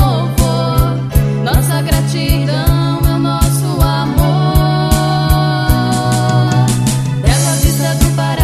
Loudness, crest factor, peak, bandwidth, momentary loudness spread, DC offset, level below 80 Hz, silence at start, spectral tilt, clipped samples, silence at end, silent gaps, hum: -13 LUFS; 12 dB; 0 dBFS; 14.5 kHz; 2 LU; under 0.1%; -20 dBFS; 0 s; -5.5 dB/octave; under 0.1%; 0 s; none; none